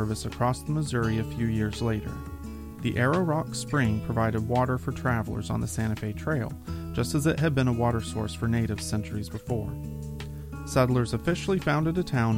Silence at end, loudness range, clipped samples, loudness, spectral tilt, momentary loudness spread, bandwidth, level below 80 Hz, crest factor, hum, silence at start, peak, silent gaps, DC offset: 0 s; 2 LU; under 0.1%; -28 LUFS; -6.5 dB/octave; 12 LU; 16.5 kHz; -42 dBFS; 20 dB; none; 0 s; -6 dBFS; none; under 0.1%